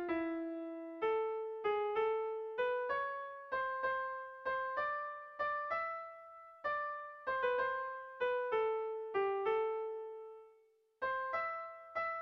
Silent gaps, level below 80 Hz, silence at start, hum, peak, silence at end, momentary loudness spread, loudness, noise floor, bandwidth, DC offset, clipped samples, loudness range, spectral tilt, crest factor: none; -76 dBFS; 0 s; none; -24 dBFS; 0 s; 10 LU; -38 LUFS; -70 dBFS; 5.8 kHz; under 0.1%; under 0.1%; 2 LU; -6 dB/octave; 14 dB